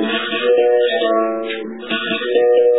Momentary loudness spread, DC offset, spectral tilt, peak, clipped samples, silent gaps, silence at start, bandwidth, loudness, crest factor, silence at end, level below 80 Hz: 9 LU; 0.4%; -7 dB/octave; -4 dBFS; under 0.1%; none; 0 s; 4.1 kHz; -17 LUFS; 12 dB; 0 s; -72 dBFS